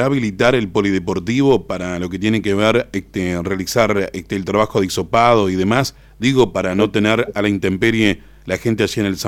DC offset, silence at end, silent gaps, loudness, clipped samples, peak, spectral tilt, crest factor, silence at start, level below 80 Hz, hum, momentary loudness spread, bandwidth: under 0.1%; 0 s; none; -17 LUFS; under 0.1%; 0 dBFS; -5.5 dB/octave; 16 dB; 0 s; -44 dBFS; none; 7 LU; 17 kHz